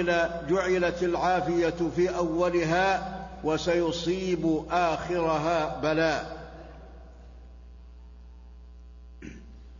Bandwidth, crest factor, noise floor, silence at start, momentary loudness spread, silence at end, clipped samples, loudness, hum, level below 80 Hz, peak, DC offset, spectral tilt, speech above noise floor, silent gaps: 7.4 kHz; 14 dB; -47 dBFS; 0 s; 20 LU; 0 s; under 0.1%; -27 LUFS; none; -46 dBFS; -14 dBFS; under 0.1%; -5.5 dB/octave; 21 dB; none